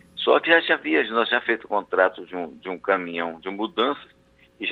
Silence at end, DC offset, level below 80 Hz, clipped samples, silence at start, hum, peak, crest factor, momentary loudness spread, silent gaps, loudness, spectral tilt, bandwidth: 0 s; under 0.1%; -68 dBFS; under 0.1%; 0.15 s; none; -2 dBFS; 22 dB; 15 LU; none; -22 LUFS; -6 dB/octave; 4.9 kHz